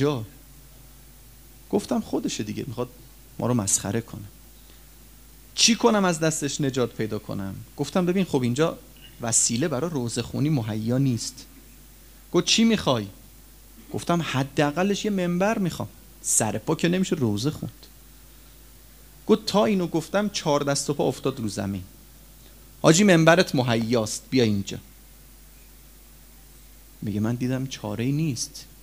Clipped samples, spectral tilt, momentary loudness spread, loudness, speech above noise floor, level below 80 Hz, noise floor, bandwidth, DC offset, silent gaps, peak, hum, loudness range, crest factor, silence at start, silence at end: under 0.1%; -4.5 dB/octave; 15 LU; -24 LUFS; 25 dB; -52 dBFS; -49 dBFS; 16 kHz; 0.1%; none; -2 dBFS; none; 8 LU; 24 dB; 0 s; 0.15 s